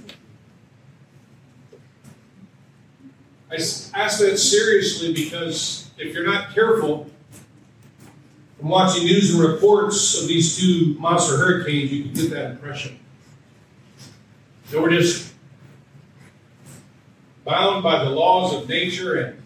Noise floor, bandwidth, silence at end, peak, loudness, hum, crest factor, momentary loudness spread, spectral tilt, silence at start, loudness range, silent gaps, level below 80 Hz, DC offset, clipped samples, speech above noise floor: -52 dBFS; 15.5 kHz; 0.05 s; -2 dBFS; -19 LUFS; none; 20 dB; 14 LU; -4 dB/octave; 0.05 s; 8 LU; none; -64 dBFS; under 0.1%; under 0.1%; 33 dB